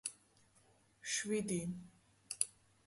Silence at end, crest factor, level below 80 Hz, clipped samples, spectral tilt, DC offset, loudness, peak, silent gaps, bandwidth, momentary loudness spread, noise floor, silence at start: 0.35 s; 28 dB; -76 dBFS; under 0.1%; -3 dB/octave; under 0.1%; -41 LUFS; -16 dBFS; none; 12 kHz; 13 LU; -71 dBFS; 0.05 s